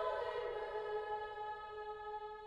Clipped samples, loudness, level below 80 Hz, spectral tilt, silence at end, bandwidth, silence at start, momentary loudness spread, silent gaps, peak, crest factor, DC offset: under 0.1%; -44 LUFS; -68 dBFS; -4.5 dB/octave; 0 s; 9.8 kHz; 0 s; 6 LU; none; -26 dBFS; 16 dB; under 0.1%